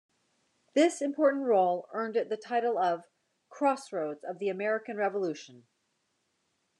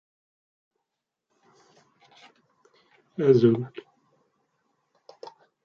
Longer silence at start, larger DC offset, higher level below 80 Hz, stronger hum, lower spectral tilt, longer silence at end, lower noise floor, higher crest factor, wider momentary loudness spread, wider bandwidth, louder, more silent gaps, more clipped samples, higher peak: second, 0.75 s vs 3.2 s; neither; second, under -90 dBFS vs -72 dBFS; neither; second, -4.5 dB/octave vs -9 dB/octave; first, 1.25 s vs 0.35 s; second, -77 dBFS vs -85 dBFS; second, 18 dB vs 24 dB; second, 9 LU vs 28 LU; first, 10.5 kHz vs 6.8 kHz; second, -30 LUFS vs -22 LUFS; neither; neither; second, -14 dBFS vs -6 dBFS